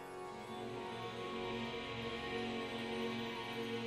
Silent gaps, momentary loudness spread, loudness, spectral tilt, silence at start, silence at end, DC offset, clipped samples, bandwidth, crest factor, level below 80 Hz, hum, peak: none; 5 LU; -43 LUFS; -5 dB/octave; 0 s; 0 s; under 0.1%; under 0.1%; 15.5 kHz; 14 dB; -66 dBFS; none; -30 dBFS